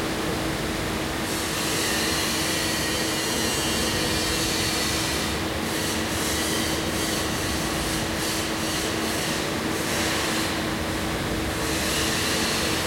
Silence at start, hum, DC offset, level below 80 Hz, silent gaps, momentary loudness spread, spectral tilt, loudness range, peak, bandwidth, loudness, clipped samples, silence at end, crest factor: 0 s; none; under 0.1%; -40 dBFS; none; 4 LU; -3 dB/octave; 2 LU; -12 dBFS; 16.5 kHz; -24 LUFS; under 0.1%; 0 s; 14 dB